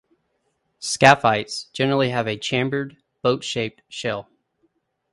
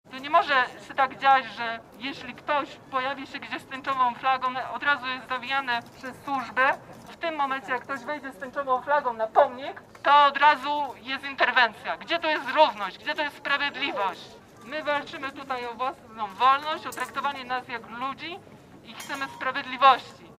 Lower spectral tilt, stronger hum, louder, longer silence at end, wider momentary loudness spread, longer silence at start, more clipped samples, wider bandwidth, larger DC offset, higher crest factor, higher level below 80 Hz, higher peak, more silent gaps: about the same, -4 dB/octave vs -3 dB/octave; neither; first, -21 LUFS vs -26 LUFS; first, 0.9 s vs 0.05 s; about the same, 15 LU vs 14 LU; first, 0.8 s vs 0.1 s; neither; second, 11.5 kHz vs 15.5 kHz; neither; about the same, 22 dB vs 22 dB; first, -58 dBFS vs -68 dBFS; first, 0 dBFS vs -4 dBFS; neither